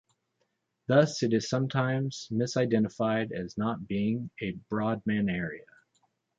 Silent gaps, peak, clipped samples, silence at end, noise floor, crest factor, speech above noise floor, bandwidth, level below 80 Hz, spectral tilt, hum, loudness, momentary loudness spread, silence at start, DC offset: none; -10 dBFS; under 0.1%; 0.75 s; -78 dBFS; 20 dB; 49 dB; 7.8 kHz; -62 dBFS; -6.5 dB/octave; none; -29 LUFS; 9 LU; 0.9 s; under 0.1%